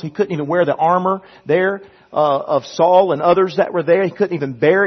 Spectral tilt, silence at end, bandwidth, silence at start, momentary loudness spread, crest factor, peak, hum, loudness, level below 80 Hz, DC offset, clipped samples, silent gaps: -7 dB/octave; 0 s; 6.4 kHz; 0.05 s; 8 LU; 14 dB; -2 dBFS; none; -16 LUFS; -62 dBFS; under 0.1%; under 0.1%; none